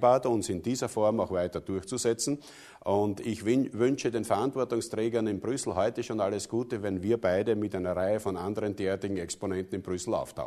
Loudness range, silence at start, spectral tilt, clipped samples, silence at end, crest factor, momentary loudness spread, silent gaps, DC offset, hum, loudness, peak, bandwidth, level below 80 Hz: 1 LU; 0 s; -5.5 dB/octave; under 0.1%; 0 s; 18 dB; 6 LU; none; under 0.1%; none; -30 LUFS; -10 dBFS; 13.5 kHz; -60 dBFS